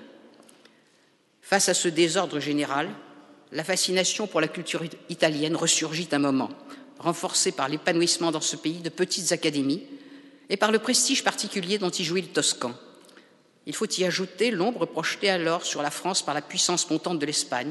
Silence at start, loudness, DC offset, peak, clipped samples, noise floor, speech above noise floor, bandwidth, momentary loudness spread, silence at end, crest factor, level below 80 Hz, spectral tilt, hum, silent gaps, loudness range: 0 s; -25 LUFS; under 0.1%; -6 dBFS; under 0.1%; -63 dBFS; 37 dB; 12 kHz; 10 LU; 0 s; 22 dB; -78 dBFS; -2.5 dB/octave; none; none; 2 LU